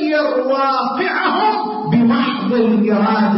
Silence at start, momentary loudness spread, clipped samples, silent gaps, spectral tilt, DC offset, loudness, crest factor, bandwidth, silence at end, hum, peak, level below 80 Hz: 0 s; 3 LU; under 0.1%; none; -10.5 dB/octave; under 0.1%; -16 LUFS; 10 dB; 5.8 kHz; 0 s; none; -6 dBFS; -56 dBFS